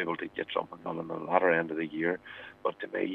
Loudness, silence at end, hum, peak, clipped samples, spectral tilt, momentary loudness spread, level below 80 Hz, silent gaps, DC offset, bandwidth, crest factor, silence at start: -32 LUFS; 0 s; none; -8 dBFS; under 0.1%; -8 dB/octave; 12 LU; -74 dBFS; none; under 0.1%; 5.2 kHz; 24 dB; 0 s